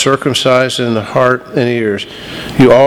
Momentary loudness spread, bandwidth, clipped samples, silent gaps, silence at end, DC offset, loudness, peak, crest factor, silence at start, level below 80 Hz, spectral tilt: 10 LU; 18 kHz; 0.6%; none; 0 s; under 0.1%; -12 LUFS; 0 dBFS; 12 dB; 0 s; -42 dBFS; -5 dB/octave